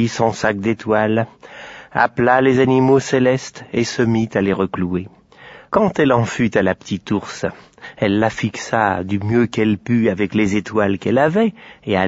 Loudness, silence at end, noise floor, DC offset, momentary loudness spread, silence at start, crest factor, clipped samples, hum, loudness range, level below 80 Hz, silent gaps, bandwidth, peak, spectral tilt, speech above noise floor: -18 LUFS; 0 s; -42 dBFS; under 0.1%; 11 LU; 0 s; 16 dB; under 0.1%; none; 3 LU; -50 dBFS; none; 8 kHz; -2 dBFS; -6.5 dB/octave; 25 dB